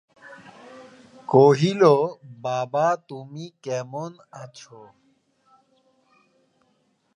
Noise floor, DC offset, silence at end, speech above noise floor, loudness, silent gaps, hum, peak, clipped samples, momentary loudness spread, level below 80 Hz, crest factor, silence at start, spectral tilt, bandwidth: -68 dBFS; under 0.1%; 2.55 s; 46 dB; -21 LUFS; none; none; -2 dBFS; under 0.1%; 25 LU; -72 dBFS; 22 dB; 0.3 s; -6.5 dB/octave; 9.8 kHz